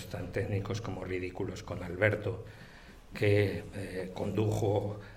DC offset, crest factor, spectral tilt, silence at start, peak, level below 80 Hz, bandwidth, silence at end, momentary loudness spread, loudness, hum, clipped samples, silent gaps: under 0.1%; 22 dB; -7 dB/octave; 0 s; -10 dBFS; -54 dBFS; 14.5 kHz; 0 s; 16 LU; -33 LUFS; none; under 0.1%; none